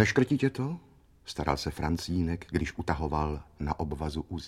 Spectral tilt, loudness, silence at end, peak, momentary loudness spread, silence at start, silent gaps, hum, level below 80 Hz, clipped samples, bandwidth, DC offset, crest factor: -6 dB/octave; -31 LUFS; 0 s; -8 dBFS; 9 LU; 0 s; none; none; -42 dBFS; under 0.1%; 15 kHz; under 0.1%; 22 dB